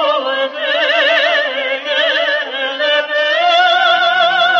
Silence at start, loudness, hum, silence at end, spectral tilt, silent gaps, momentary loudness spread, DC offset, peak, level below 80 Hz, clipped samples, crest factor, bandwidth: 0 s; -13 LUFS; none; 0 s; -1 dB/octave; none; 6 LU; under 0.1%; -2 dBFS; -70 dBFS; under 0.1%; 12 dB; 7.6 kHz